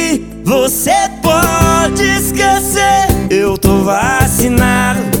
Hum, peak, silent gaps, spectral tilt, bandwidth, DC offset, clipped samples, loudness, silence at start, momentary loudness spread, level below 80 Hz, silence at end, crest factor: none; 0 dBFS; none; -4 dB/octave; 19 kHz; 0.6%; under 0.1%; -11 LUFS; 0 s; 3 LU; -26 dBFS; 0 s; 12 dB